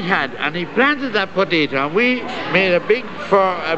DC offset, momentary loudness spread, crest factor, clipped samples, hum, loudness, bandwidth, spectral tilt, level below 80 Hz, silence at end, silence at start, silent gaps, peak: 1%; 5 LU; 16 dB; under 0.1%; none; -17 LUFS; 8.2 kHz; -6 dB/octave; -58 dBFS; 0 s; 0 s; none; -2 dBFS